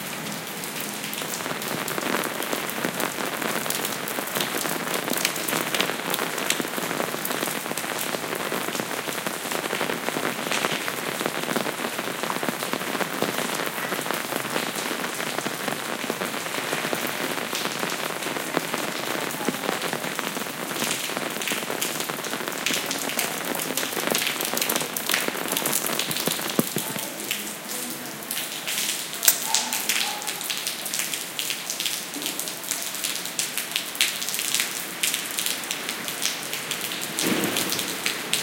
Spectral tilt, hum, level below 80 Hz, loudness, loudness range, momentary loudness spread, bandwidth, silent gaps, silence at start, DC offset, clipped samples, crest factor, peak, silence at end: -1.5 dB/octave; none; -70 dBFS; -26 LUFS; 3 LU; 5 LU; 17.5 kHz; none; 0 s; under 0.1%; under 0.1%; 28 dB; 0 dBFS; 0 s